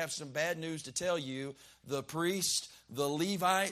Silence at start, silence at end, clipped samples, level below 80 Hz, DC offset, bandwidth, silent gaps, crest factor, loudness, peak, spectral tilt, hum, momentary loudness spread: 0 s; 0 s; under 0.1%; -72 dBFS; under 0.1%; 15.5 kHz; none; 20 dB; -34 LUFS; -16 dBFS; -3 dB/octave; none; 11 LU